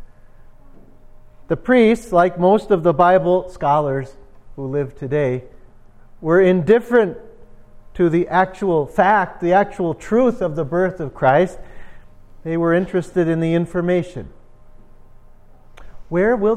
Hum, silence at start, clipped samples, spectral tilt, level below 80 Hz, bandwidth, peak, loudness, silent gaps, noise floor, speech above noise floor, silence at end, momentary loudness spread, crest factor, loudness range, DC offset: none; 0 s; under 0.1%; -8 dB/octave; -44 dBFS; 10.5 kHz; 0 dBFS; -18 LUFS; none; -43 dBFS; 26 dB; 0 s; 11 LU; 18 dB; 5 LU; under 0.1%